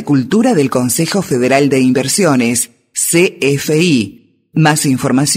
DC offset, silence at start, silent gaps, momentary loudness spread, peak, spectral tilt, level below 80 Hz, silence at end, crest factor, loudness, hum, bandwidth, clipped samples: under 0.1%; 0 s; none; 5 LU; 0 dBFS; -4.5 dB/octave; -54 dBFS; 0 s; 12 dB; -12 LUFS; none; 16.5 kHz; under 0.1%